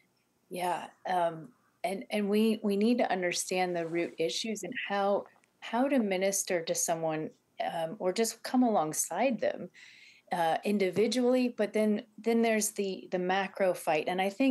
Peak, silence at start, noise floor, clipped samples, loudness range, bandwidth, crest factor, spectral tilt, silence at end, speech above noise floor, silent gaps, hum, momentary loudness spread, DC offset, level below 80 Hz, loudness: -16 dBFS; 0.5 s; -72 dBFS; under 0.1%; 2 LU; 12.5 kHz; 14 dB; -4 dB/octave; 0 s; 42 dB; none; none; 8 LU; under 0.1%; -86 dBFS; -31 LUFS